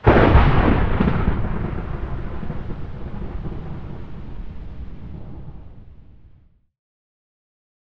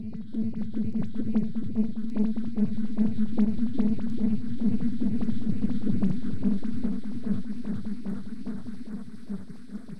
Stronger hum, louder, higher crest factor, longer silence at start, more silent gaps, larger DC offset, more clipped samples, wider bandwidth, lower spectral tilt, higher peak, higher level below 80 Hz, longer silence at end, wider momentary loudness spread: neither; first, -21 LUFS vs -30 LUFS; first, 20 dB vs 14 dB; about the same, 0 s vs 0 s; neither; second, under 0.1% vs 5%; neither; about the same, 5.6 kHz vs 5.8 kHz; about the same, -9.5 dB/octave vs -9.5 dB/octave; first, 0 dBFS vs -12 dBFS; first, -26 dBFS vs -46 dBFS; first, 1.7 s vs 0 s; first, 22 LU vs 12 LU